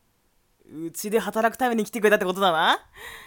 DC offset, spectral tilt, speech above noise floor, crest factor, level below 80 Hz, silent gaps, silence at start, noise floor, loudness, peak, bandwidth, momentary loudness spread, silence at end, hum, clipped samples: under 0.1%; -3.5 dB/octave; 42 dB; 20 dB; -62 dBFS; none; 0.7 s; -66 dBFS; -23 LUFS; -6 dBFS; 18 kHz; 16 LU; 0 s; none; under 0.1%